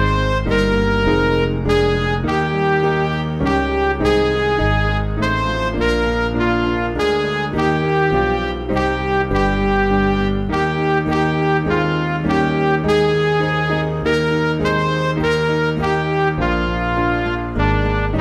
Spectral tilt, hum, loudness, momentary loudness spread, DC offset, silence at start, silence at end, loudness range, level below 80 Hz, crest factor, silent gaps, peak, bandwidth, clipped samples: -7 dB/octave; none; -18 LUFS; 3 LU; 0.1%; 0 s; 0 s; 1 LU; -28 dBFS; 14 dB; none; -4 dBFS; 11.5 kHz; under 0.1%